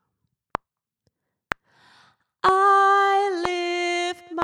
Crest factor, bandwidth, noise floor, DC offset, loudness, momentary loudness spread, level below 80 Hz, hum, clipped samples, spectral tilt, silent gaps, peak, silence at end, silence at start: 22 dB; 14 kHz; -77 dBFS; under 0.1%; -20 LUFS; 18 LU; -58 dBFS; none; under 0.1%; -3 dB/octave; none; -2 dBFS; 0 s; 2.45 s